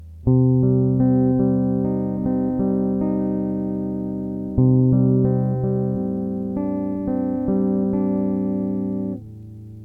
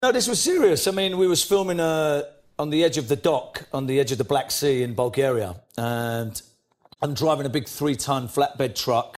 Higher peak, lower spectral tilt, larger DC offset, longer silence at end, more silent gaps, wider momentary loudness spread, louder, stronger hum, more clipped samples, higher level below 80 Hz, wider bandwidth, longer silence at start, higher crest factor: about the same, -6 dBFS vs -6 dBFS; first, -13.5 dB/octave vs -4 dB/octave; neither; about the same, 0 s vs 0 s; neither; about the same, 9 LU vs 10 LU; about the same, -21 LUFS vs -23 LUFS; neither; neither; first, -42 dBFS vs -56 dBFS; second, 2.2 kHz vs 16 kHz; about the same, 0 s vs 0 s; about the same, 14 dB vs 16 dB